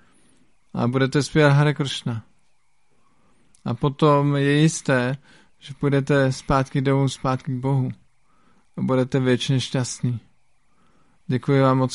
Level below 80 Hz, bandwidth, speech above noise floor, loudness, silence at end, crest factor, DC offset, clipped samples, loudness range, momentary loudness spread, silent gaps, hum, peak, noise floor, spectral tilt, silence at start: -48 dBFS; 11.5 kHz; 48 dB; -21 LUFS; 0 s; 18 dB; 0.1%; under 0.1%; 4 LU; 13 LU; none; none; -4 dBFS; -68 dBFS; -6 dB/octave; 0.75 s